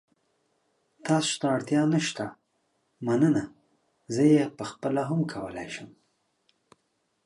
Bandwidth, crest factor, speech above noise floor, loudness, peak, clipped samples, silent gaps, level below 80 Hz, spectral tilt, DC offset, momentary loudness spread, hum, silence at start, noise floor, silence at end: 11.5 kHz; 20 dB; 49 dB; -27 LUFS; -10 dBFS; under 0.1%; none; -68 dBFS; -5.5 dB/octave; under 0.1%; 16 LU; none; 1.05 s; -75 dBFS; 1.35 s